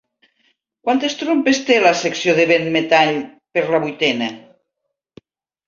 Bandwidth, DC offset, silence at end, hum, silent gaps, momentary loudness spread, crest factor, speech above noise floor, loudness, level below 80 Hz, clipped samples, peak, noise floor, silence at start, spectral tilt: 7.6 kHz; under 0.1%; 1.3 s; none; none; 9 LU; 18 dB; 61 dB; -17 LUFS; -64 dBFS; under 0.1%; -2 dBFS; -77 dBFS; 0.85 s; -4 dB/octave